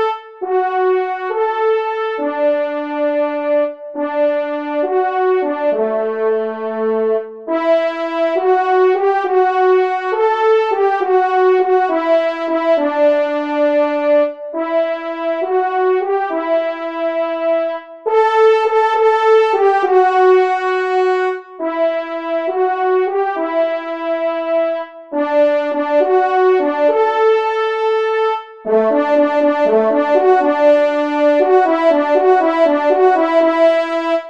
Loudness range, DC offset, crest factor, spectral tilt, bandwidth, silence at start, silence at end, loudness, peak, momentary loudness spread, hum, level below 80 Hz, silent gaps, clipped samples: 5 LU; 0.2%; 14 dB; -5 dB/octave; 7.4 kHz; 0 s; 0 s; -15 LUFS; -2 dBFS; 8 LU; none; -70 dBFS; none; under 0.1%